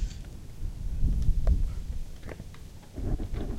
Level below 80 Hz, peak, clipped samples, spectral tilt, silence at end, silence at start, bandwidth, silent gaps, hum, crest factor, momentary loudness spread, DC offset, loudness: -30 dBFS; -12 dBFS; under 0.1%; -7.5 dB/octave; 0 s; 0 s; 11.5 kHz; none; none; 16 dB; 15 LU; under 0.1%; -34 LUFS